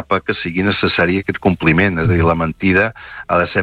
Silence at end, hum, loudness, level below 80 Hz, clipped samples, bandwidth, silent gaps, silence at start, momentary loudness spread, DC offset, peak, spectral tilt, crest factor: 0 s; none; -16 LUFS; -38 dBFS; under 0.1%; 5.2 kHz; none; 0 s; 5 LU; under 0.1%; -2 dBFS; -8.5 dB/octave; 14 dB